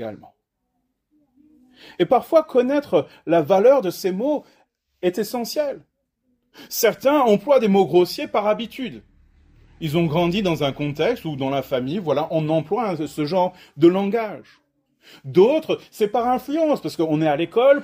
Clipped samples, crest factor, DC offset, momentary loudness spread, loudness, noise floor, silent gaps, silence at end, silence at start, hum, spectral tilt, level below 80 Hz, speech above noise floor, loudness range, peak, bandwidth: under 0.1%; 18 dB; under 0.1%; 9 LU; -20 LUFS; -74 dBFS; none; 0 s; 0 s; none; -6 dB/octave; -58 dBFS; 54 dB; 4 LU; -4 dBFS; 16 kHz